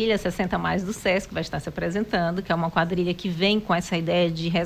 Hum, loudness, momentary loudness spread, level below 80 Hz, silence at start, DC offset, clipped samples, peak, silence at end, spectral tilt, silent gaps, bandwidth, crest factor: none; -25 LUFS; 5 LU; -46 dBFS; 0 s; under 0.1%; under 0.1%; -6 dBFS; 0 s; -5.5 dB/octave; none; 15.5 kHz; 18 dB